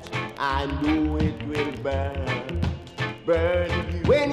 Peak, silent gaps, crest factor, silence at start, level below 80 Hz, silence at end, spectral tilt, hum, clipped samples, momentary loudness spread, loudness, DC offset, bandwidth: -6 dBFS; none; 18 dB; 0 s; -36 dBFS; 0 s; -7 dB/octave; none; under 0.1%; 7 LU; -26 LUFS; under 0.1%; 11.5 kHz